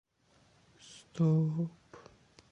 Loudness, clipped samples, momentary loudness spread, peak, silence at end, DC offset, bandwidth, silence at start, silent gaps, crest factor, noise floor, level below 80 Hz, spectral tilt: -32 LUFS; under 0.1%; 25 LU; -18 dBFS; 0.55 s; under 0.1%; 8.8 kHz; 0.9 s; none; 16 dB; -68 dBFS; -74 dBFS; -8.5 dB/octave